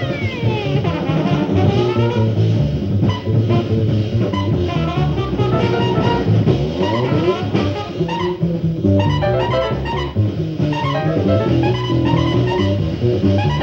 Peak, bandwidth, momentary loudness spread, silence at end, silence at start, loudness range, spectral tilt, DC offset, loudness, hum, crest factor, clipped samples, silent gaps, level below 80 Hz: -2 dBFS; 7 kHz; 4 LU; 0 s; 0 s; 1 LU; -8 dB/octave; under 0.1%; -17 LUFS; none; 16 dB; under 0.1%; none; -34 dBFS